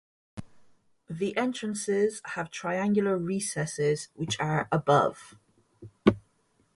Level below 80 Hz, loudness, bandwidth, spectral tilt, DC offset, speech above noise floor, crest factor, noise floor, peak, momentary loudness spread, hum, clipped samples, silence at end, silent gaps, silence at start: -60 dBFS; -28 LUFS; 11.5 kHz; -5 dB/octave; under 0.1%; 41 dB; 24 dB; -69 dBFS; -6 dBFS; 18 LU; none; under 0.1%; 0.55 s; none; 0.35 s